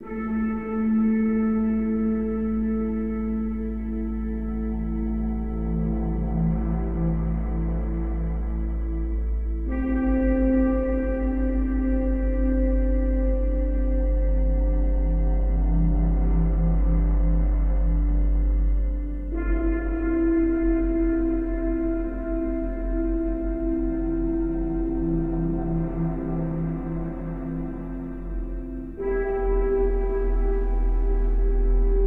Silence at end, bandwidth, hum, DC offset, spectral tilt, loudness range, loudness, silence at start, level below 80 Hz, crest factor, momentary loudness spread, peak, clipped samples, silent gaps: 0 s; 2.9 kHz; none; 0.6%; -12 dB/octave; 4 LU; -26 LUFS; 0 s; -24 dBFS; 12 dB; 7 LU; -10 dBFS; under 0.1%; none